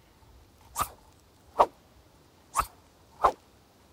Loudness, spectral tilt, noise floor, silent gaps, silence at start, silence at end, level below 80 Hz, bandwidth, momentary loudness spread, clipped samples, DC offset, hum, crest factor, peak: -30 LUFS; -3 dB/octave; -59 dBFS; none; 0.75 s; 0.6 s; -54 dBFS; 16 kHz; 13 LU; under 0.1%; under 0.1%; none; 28 dB; -6 dBFS